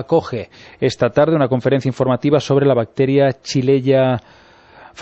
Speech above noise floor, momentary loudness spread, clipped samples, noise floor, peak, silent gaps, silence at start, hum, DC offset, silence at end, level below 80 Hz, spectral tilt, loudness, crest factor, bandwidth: 28 dB; 7 LU; under 0.1%; -44 dBFS; -2 dBFS; none; 0 s; none; under 0.1%; 0 s; -52 dBFS; -7 dB/octave; -16 LUFS; 14 dB; 8.2 kHz